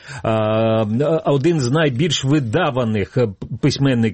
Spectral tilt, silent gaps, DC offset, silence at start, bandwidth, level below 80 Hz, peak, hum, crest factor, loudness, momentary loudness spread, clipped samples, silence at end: -6 dB/octave; none; under 0.1%; 0.05 s; 8.8 kHz; -48 dBFS; -4 dBFS; none; 12 dB; -18 LUFS; 4 LU; under 0.1%; 0 s